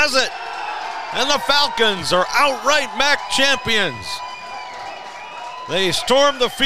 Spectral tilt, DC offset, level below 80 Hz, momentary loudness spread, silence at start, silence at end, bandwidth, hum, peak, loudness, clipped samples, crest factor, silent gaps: -2 dB/octave; 2%; -50 dBFS; 16 LU; 0 s; 0 s; 16 kHz; none; -2 dBFS; -17 LUFS; under 0.1%; 16 dB; none